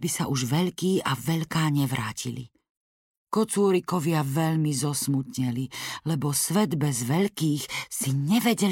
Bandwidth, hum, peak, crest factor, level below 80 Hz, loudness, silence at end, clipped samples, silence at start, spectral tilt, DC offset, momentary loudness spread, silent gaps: 17 kHz; none; -12 dBFS; 14 dB; -62 dBFS; -26 LUFS; 0 s; under 0.1%; 0 s; -5 dB/octave; under 0.1%; 7 LU; 2.70-3.25 s